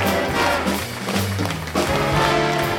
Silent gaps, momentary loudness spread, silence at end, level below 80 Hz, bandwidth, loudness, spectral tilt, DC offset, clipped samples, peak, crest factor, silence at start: none; 6 LU; 0 s; -38 dBFS; 18 kHz; -20 LUFS; -4.5 dB/octave; under 0.1%; under 0.1%; -4 dBFS; 16 dB; 0 s